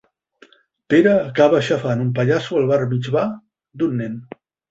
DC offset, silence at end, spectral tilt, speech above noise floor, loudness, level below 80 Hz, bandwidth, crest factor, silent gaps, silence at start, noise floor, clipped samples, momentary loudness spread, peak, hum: under 0.1%; 0.45 s; -7.5 dB/octave; 35 dB; -18 LUFS; -58 dBFS; 8 kHz; 18 dB; none; 0.9 s; -53 dBFS; under 0.1%; 11 LU; -2 dBFS; none